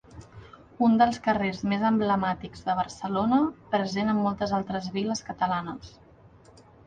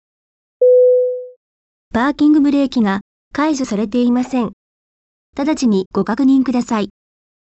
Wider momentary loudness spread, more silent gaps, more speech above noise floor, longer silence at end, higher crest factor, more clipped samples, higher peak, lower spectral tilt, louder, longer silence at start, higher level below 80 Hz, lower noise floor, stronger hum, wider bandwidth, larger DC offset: second, 8 LU vs 12 LU; second, none vs 1.36-1.91 s, 3.01-3.31 s, 4.53-5.33 s, 5.86-5.91 s; second, 28 dB vs over 75 dB; first, 0.95 s vs 0.6 s; first, 18 dB vs 12 dB; neither; about the same, -8 dBFS vs -6 dBFS; about the same, -6 dB/octave vs -6 dB/octave; second, -26 LUFS vs -16 LUFS; second, 0.1 s vs 0.6 s; second, -56 dBFS vs -50 dBFS; second, -54 dBFS vs under -90 dBFS; neither; first, 9.2 kHz vs 8.2 kHz; neither